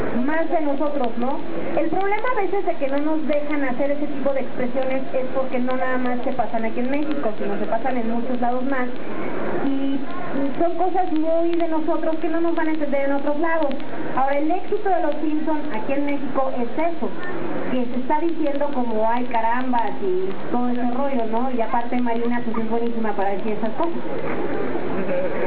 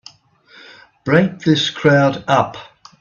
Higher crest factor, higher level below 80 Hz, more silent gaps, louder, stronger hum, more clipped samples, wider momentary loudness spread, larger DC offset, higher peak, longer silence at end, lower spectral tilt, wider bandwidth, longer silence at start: about the same, 16 dB vs 18 dB; about the same, -56 dBFS vs -56 dBFS; neither; second, -24 LUFS vs -15 LUFS; neither; neither; second, 4 LU vs 12 LU; first, 10% vs under 0.1%; second, -8 dBFS vs 0 dBFS; second, 0 s vs 0.35 s; first, -9.5 dB/octave vs -6 dB/octave; second, 4 kHz vs 7.2 kHz; second, 0 s vs 1.05 s